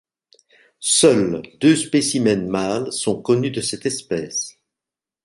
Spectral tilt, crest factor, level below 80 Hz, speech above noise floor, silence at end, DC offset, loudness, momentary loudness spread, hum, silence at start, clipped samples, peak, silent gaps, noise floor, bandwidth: -4 dB/octave; 18 dB; -56 dBFS; 69 dB; 0.75 s; under 0.1%; -19 LUFS; 11 LU; none; 0.8 s; under 0.1%; -2 dBFS; none; -88 dBFS; 11.5 kHz